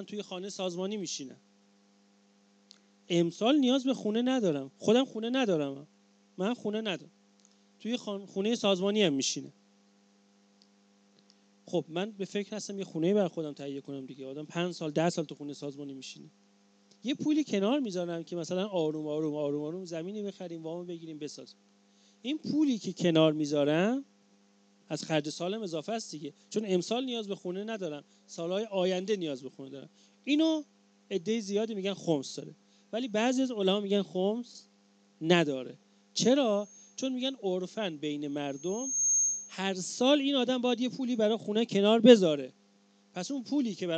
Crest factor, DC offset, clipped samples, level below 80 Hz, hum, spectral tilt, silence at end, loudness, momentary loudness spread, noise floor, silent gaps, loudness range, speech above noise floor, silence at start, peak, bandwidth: 26 dB; under 0.1%; under 0.1%; -86 dBFS; none; -4 dB/octave; 0 s; -31 LUFS; 15 LU; -65 dBFS; none; 8 LU; 35 dB; 0 s; -4 dBFS; 9 kHz